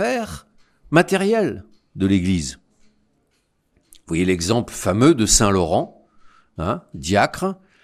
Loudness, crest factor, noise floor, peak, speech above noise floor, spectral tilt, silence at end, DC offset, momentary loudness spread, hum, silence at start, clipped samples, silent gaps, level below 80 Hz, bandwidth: -19 LUFS; 20 dB; -67 dBFS; 0 dBFS; 48 dB; -4.5 dB/octave; 0.3 s; under 0.1%; 15 LU; none; 0 s; under 0.1%; none; -38 dBFS; 14.5 kHz